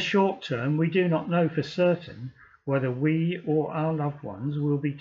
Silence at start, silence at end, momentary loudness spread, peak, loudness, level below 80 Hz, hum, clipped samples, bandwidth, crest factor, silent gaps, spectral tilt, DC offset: 0 s; 0 s; 9 LU; -12 dBFS; -26 LUFS; -68 dBFS; none; under 0.1%; 7.4 kHz; 14 dB; none; -8 dB/octave; under 0.1%